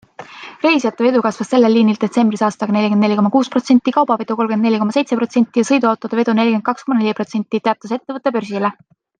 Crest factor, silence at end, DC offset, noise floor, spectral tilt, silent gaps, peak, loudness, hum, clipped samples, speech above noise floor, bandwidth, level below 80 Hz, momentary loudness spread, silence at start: 14 dB; 0.5 s; under 0.1%; -35 dBFS; -6 dB/octave; none; -2 dBFS; -16 LUFS; none; under 0.1%; 20 dB; 9.4 kHz; -66 dBFS; 7 LU; 0.2 s